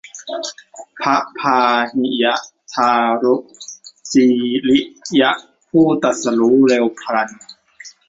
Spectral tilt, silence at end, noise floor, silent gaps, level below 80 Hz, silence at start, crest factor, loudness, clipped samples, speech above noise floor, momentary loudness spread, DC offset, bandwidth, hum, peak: -4 dB/octave; 0.2 s; -42 dBFS; none; -60 dBFS; 0.15 s; 16 dB; -16 LUFS; under 0.1%; 26 dB; 13 LU; under 0.1%; 8 kHz; none; -2 dBFS